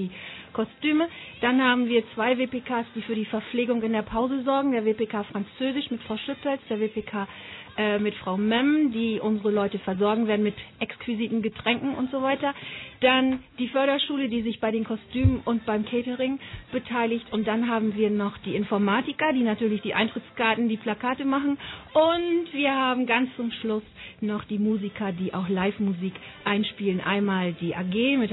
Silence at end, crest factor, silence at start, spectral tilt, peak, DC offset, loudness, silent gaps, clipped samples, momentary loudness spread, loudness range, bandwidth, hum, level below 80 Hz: 0 s; 18 dB; 0 s; -9.5 dB/octave; -8 dBFS; under 0.1%; -26 LUFS; none; under 0.1%; 9 LU; 3 LU; 4.1 kHz; none; -52 dBFS